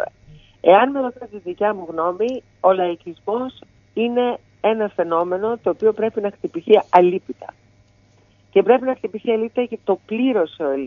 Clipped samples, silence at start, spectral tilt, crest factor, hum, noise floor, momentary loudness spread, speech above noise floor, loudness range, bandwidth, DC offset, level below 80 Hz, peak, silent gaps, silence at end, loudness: under 0.1%; 0 s; -7.5 dB/octave; 20 dB; none; -55 dBFS; 14 LU; 36 dB; 3 LU; 6.6 kHz; under 0.1%; -62 dBFS; 0 dBFS; none; 0 s; -19 LUFS